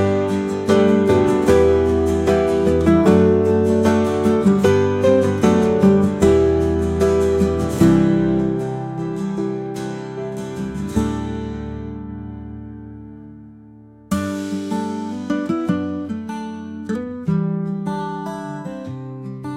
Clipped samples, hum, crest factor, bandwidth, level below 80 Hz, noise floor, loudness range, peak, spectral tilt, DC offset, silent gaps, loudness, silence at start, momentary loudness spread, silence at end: under 0.1%; none; 16 dB; 15 kHz; -40 dBFS; -43 dBFS; 12 LU; -2 dBFS; -7.5 dB/octave; under 0.1%; none; -18 LUFS; 0 s; 16 LU; 0 s